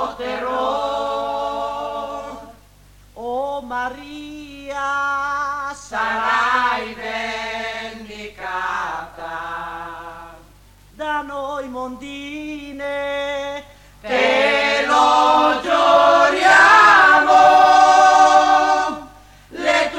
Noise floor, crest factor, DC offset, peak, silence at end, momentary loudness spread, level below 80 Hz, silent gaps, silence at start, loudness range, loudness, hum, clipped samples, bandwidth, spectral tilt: -48 dBFS; 16 dB; under 0.1%; -2 dBFS; 0 s; 21 LU; -50 dBFS; none; 0 s; 17 LU; -16 LUFS; 50 Hz at -65 dBFS; under 0.1%; 15 kHz; -2 dB/octave